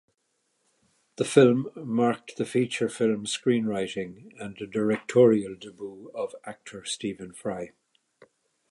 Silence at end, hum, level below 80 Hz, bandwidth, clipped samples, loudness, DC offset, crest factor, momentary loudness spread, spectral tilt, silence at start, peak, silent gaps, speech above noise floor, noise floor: 1.05 s; none; -68 dBFS; 11.5 kHz; under 0.1%; -26 LUFS; under 0.1%; 24 dB; 20 LU; -5.5 dB/octave; 1.2 s; -4 dBFS; none; 49 dB; -75 dBFS